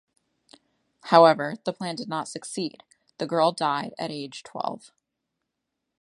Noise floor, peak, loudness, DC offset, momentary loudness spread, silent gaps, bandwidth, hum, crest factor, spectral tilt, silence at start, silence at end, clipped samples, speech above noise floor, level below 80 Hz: -82 dBFS; -2 dBFS; -25 LUFS; under 0.1%; 18 LU; none; 11.5 kHz; none; 26 dB; -4.5 dB/octave; 1.05 s; 1.25 s; under 0.1%; 58 dB; -78 dBFS